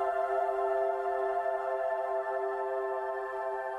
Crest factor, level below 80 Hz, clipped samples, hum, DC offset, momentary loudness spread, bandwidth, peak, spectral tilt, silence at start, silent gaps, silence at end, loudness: 12 dB; -70 dBFS; under 0.1%; none; under 0.1%; 5 LU; 10.5 kHz; -20 dBFS; -4.5 dB/octave; 0 s; none; 0 s; -32 LUFS